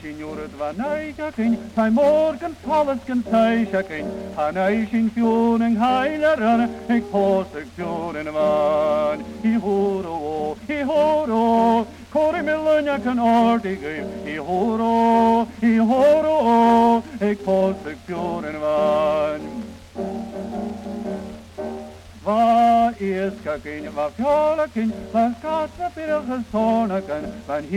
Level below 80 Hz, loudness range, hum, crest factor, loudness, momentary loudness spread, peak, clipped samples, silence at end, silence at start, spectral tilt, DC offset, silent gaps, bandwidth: -50 dBFS; 5 LU; none; 14 dB; -21 LUFS; 13 LU; -6 dBFS; under 0.1%; 0 s; 0 s; -7 dB/octave; under 0.1%; none; 12 kHz